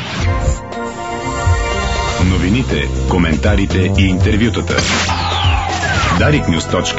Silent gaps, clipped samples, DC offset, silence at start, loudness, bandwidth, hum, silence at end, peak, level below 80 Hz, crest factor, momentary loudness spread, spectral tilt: none; under 0.1%; 0.7%; 0 s; -15 LUFS; 8 kHz; none; 0 s; 0 dBFS; -22 dBFS; 14 dB; 6 LU; -5 dB/octave